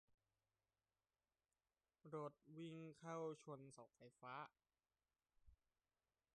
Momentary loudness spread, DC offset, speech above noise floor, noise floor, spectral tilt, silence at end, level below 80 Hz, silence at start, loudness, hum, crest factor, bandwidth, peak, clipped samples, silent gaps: 12 LU; under 0.1%; over 34 dB; under -90 dBFS; -6 dB/octave; 0.8 s; -88 dBFS; 2.05 s; -56 LUFS; none; 20 dB; 9.4 kHz; -40 dBFS; under 0.1%; none